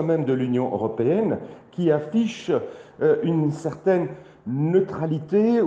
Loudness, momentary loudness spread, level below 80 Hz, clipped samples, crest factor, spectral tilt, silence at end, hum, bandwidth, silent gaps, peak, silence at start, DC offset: -23 LUFS; 9 LU; -64 dBFS; under 0.1%; 14 dB; -8.5 dB/octave; 0 s; none; 8.6 kHz; none; -8 dBFS; 0 s; under 0.1%